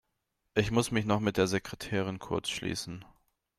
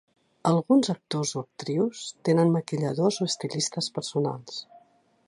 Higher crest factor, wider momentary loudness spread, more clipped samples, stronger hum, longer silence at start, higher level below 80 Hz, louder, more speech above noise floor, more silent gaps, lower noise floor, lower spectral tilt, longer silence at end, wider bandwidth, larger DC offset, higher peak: about the same, 20 dB vs 18 dB; about the same, 8 LU vs 9 LU; neither; neither; about the same, 0.55 s vs 0.45 s; first, -56 dBFS vs -72 dBFS; second, -31 LUFS vs -26 LUFS; first, 50 dB vs 35 dB; neither; first, -81 dBFS vs -61 dBFS; about the same, -5 dB/octave vs -5.5 dB/octave; about the same, 0.55 s vs 0.5 s; first, 15 kHz vs 11.5 kHz; neither; about the same, -12 dBFS vs -10 dBFS